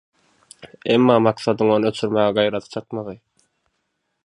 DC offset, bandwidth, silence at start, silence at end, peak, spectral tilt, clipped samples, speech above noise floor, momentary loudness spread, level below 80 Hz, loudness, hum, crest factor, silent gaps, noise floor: under 0.1%; 11.5 kHz; 0.85 s; 1.1 s; -2 dBFS; -6.5 dB/octave; under 0.1%; 55 dB; 15 LU; -62 dBFS; -19 LUFS; none; 20 dB; none; -73 dBFS